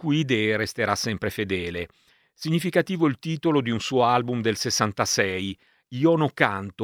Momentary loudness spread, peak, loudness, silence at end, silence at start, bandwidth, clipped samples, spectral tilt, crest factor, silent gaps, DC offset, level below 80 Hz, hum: 10 LU; -2 dBFS; -24 LUFS; 0 s; 0 s; 19 kHz; under 0.1%; -4.5 dB/octave; 22 dB; none; under 0.1%; -58 dBFS; none